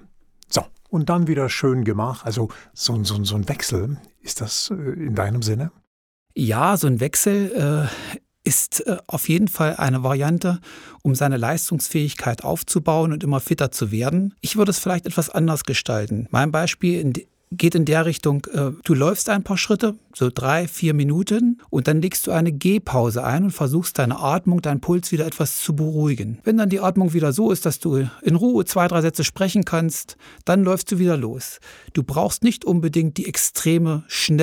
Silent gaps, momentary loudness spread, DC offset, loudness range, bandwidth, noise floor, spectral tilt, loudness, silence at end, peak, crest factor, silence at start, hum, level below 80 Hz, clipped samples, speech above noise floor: 5.87-6.26 s; 7 LU; under 0.1%; 3 LU; 19.5 kHz; -51 dBFS; -5 dB/octave; -21 LUFS; 0 s; -2 dBFS; 18 dB; 0.5 s; none; -52 dBFS; under 0.1%; 31 dB